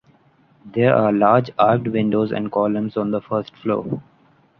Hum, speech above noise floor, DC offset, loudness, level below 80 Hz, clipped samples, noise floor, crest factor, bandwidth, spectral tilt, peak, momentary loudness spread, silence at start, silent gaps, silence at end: none; 37 dB; under 0.1%; -19 LUFS; -60 dBFS; under 0.1%; -56 dBFS; 18 dB; 5.8 kHz; -10 dB/octave; -2 dBFS; 9 LU; 0.65 s; none; 0.6 s